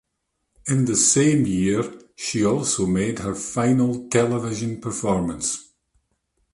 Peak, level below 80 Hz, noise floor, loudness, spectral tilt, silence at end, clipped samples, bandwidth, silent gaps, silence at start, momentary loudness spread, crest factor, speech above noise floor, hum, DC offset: -4 dBFS; -50 dBFS; -76 dBFS; -21 LUFS; -4.5 dB/octave; 0.9 s; under 0.1%; 11.5 kHz; none; 0.65 s; 11 LU; 20 dB; 55 dB; none; under 0.1%